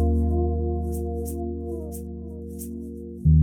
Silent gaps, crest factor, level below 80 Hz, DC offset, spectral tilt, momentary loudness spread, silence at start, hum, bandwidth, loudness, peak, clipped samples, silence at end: none; 16 dB; -30 dBFS; under 0.1%; -10 dB/octave; 13 LU; 0 s; none; 16 kHz; -28 LUFS; -8 dBFS; under 0.1%; 0 s